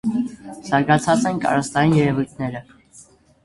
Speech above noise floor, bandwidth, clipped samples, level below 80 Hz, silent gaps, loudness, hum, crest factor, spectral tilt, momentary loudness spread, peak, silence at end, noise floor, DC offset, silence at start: 30 dB; 11.5 kHz; under 0.1%; -52 dBFS; none; -20 LUFS; none; 20 dB; -6 dB/octave; 12 LU; 0 dBFS; 0.45 s; -49 dBFS; under 0.1%; 0.05 s